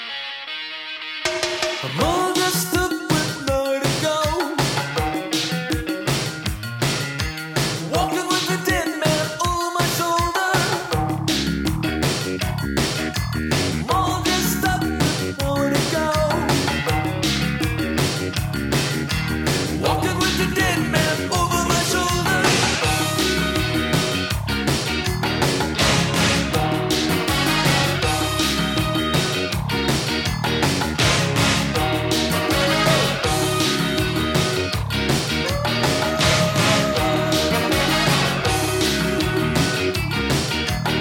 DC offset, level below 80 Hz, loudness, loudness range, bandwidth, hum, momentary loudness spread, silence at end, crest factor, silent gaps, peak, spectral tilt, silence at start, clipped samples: under 0.1%; -36 dBFS; -20 LUFS; 3 LU; 19 kHz; none; 5 LU; 0 s; 16 dB; none; -4 dBFS; -4 dB/octave; 0 s; under 0.1%